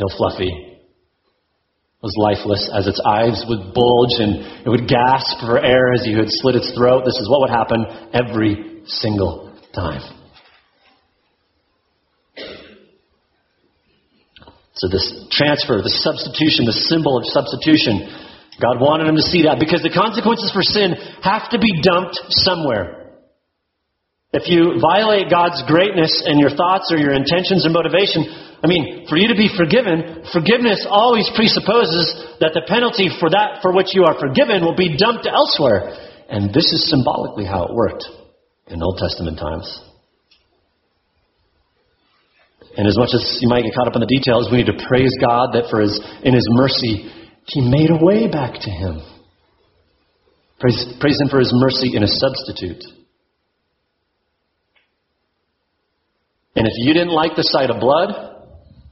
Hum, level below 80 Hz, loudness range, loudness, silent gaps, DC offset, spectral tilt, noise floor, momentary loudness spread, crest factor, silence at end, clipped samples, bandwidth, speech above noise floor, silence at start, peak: none; -44 dBFS; 9 LU; -16 LUFS; none; under 0.1%; -4 dB/octave; -73 dBFS; 11 LU; 18 dB; 0.55 s; under 0.1%; 6 kHz; 57 dB; 0 s; 0 dBFS